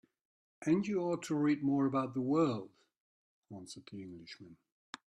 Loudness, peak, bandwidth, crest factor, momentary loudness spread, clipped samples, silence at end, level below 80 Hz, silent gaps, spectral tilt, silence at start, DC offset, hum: -34 LUFS; -20 dBFS; 11 kHz; 18 dB; 20 LU; under 0.1%; 0.5 s; -78 dBFS; 2.97-3.42 s; -7 dB/octave; 0.6 s; under 0.1%; none